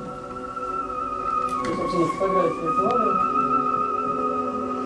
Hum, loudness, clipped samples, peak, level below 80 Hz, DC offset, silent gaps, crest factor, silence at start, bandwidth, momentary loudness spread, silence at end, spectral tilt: none; -23 LUFS; under 0.1%; -10 dBFS; -52 dBFS; under 0.1%; none; 14 dB; 0 s; 11 kHz; 8 LU; 0 s; -6.5 dB/octave